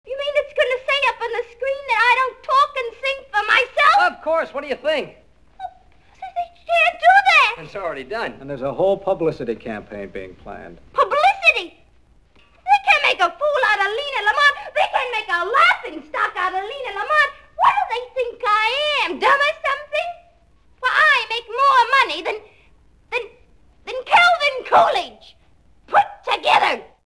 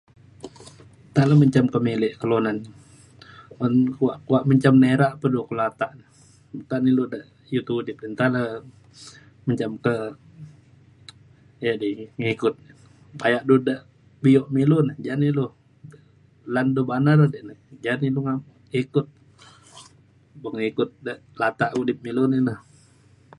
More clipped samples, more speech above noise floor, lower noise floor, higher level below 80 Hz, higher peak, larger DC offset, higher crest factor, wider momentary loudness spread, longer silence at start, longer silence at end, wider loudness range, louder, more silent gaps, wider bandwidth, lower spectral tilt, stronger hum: neither; about the same, 31 dB vs 33 dB; about the same, -55 dBFS vs -55 dBFS; first, -54 dBFS vs -62 dBFS; about the same, -2 dBFS vs -4 dBFS; first, 0.2% vs under 0.1%; about the same, 18 dB vs 20 dB; about the same, 17 LU vs 17 LU; second, 0.05 s vs 0.45 s; second, 0.25 s vs 0.8 s; second, 3 LU vs 8 LU; first, -18 LUFS vs -22 LUFS; neither; about the same, 11 kHz vs 11 kHz; second, -2.5 dB/octave vs -8 dB/octave; neither